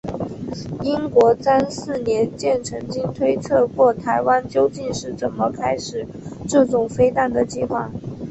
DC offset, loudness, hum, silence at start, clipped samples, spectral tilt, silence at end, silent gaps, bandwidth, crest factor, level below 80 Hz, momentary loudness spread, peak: under 0.1%; -20 LUFS; none; 0.05 s; under 0.1%; -6 dB/octave; 0 s; none; 8.4 kHz; 18 dB; -48 dBFS; 13 LU; -2 dBFS